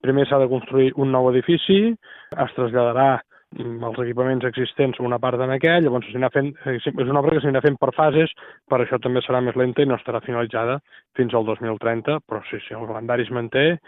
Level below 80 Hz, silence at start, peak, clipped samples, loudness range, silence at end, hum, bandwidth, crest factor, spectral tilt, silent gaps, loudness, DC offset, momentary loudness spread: -60 dBFS; 0.05 s; -4 dBFS; under 0.1%; 4 LU; 0.1 s; none; 4 kHz; 16 dB; -10 dB/octave; none; -21 LUFS; under 0.1%; 12 LU